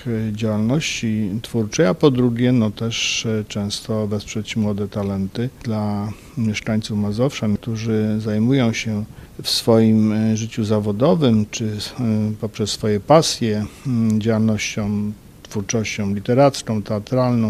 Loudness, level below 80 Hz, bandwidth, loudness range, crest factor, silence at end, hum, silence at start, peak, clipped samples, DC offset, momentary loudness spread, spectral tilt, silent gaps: -20 LUFS; -46 dBFS; 14.5 kHz; 5 LU; 20 dB; 0 s; none; 0 s; 0 dBFS; under 0.1%; under 0.1%; 9 LU; -5.5 dB/octave; none